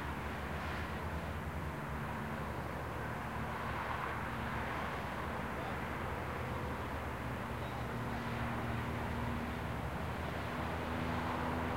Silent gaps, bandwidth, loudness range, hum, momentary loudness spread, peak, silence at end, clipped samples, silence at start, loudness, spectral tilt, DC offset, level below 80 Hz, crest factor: none; 16 kHz; 2 LU; none; 3 LU; -24 dBFS; 0 s; under 0.1%; 0 s; -40 LUFS; -6 dB/octave; 0.1%; -48 dBFS; 14 dB